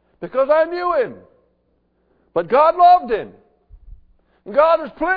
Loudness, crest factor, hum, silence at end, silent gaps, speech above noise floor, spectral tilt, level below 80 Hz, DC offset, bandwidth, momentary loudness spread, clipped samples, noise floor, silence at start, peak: -17 LUFS; 16 dB; none; 0 s; none; 48 dB; -7.5 dB/octave; -50 dBFS; under 0.1%; 5 kHz; 13 LU; under 0.1%; -64 dBFS; 0.2 s; -2 dBFS